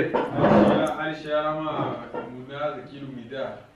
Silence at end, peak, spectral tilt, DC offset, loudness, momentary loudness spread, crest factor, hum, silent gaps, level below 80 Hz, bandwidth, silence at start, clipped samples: 0.15 s; -6 dBFS; -7.5 dB/octave; under 0.1%; -24 LUFS; 18 LU; 18 dB; none; none; -54 dBFS; 11 kHz; 0 s; under 0.1%